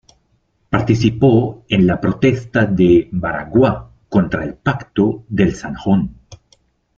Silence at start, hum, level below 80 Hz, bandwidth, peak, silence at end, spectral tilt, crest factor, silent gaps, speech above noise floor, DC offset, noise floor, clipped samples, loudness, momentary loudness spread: 0.7 s; none; -40 dBFS; 7.2 kHz; 0 dBFS; 0.65 s; -8 dB/octave; 16 dB; none; 47 dB; under 0.1%; -62 dBFS; under 0.1%; -16 LUFS; 8 LU